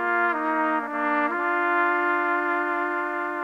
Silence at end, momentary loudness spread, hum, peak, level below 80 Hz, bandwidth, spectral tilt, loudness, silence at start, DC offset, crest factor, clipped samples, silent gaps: 0 s; 4 LU; none; -8 dBFS; -78 dBFS; 10 kHz; -4.5 dB/octave; -24 LUFS; 0 s; under 0.1%; 16 dB; under 0.1%; none